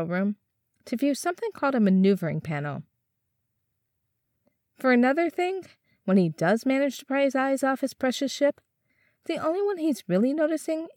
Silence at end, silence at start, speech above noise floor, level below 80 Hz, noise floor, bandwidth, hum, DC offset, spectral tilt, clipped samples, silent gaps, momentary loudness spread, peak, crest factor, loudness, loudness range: 0.05 s; 0 s; 54 dB; -76 dBFS; -79 dBFS; 17.5 kHz; none; under 0.1%; -6 dB/octave; under 0.1%; none; 10 LU; -10 dBFS; 16 dB; -25 LUFS; 4 LU